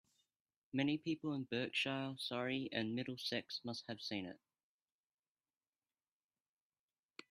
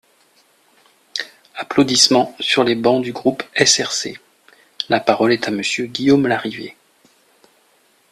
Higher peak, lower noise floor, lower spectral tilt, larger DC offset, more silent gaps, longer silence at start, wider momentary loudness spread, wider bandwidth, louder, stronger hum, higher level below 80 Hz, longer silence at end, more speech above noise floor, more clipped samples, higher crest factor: second, -22 dBFS vs 0 dBFS; first, under -90 dBFS vs -57 dBFS; first, -5 dB/octave vs -3 dB/octave; neither; neither; second, 0.75 s vs 1.15 s; second, 8 LU vs 16 LU; second, 14 kHz vs 15.5 kHz; second, -42 LUFS vs -17 LUFS; neither; second, -84 dBFS vs -60 dBFS; first, 2.95 s vs 1.4 s; first, over 48 dB vs 41 dB; neither; about the same, 22 dB vs 20 dB